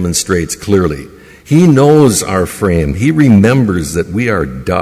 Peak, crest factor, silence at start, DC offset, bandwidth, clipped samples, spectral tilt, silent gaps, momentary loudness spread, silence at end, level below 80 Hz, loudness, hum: 0 dBFS; 10 dB; 0 s; under 0.1%; 16 kHz; under 0.1%; -6 dB/octave; none; 9 LU; 0 s; -28 dBFS; -11 LUFS; none